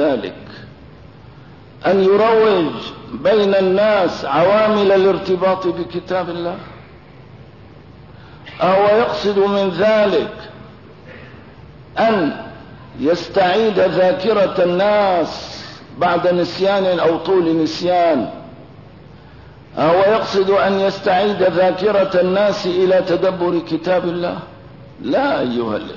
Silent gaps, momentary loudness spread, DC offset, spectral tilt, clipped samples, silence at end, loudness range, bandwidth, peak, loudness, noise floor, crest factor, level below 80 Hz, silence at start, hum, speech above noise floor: none; 16 LU; 0.3%; -6.5 dB/octave; under 0.1%; 0 s; 5 LU; 6 kHz; -4 dBFS; -16 LUFS; -40 dBFS; 12 dB; -50 dBFS; 0 s; none; 25 dB